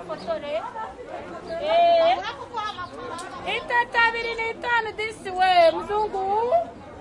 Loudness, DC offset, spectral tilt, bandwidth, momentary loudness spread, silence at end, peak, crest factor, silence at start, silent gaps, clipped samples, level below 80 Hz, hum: -23 LUFS; under 0.1%; -3.5 dB/octave; 11.5 kHz; 16 LU; 0 s; -6 dBFS; 18 dB; 0 s; none; under 0.1%; -54 dBFS; none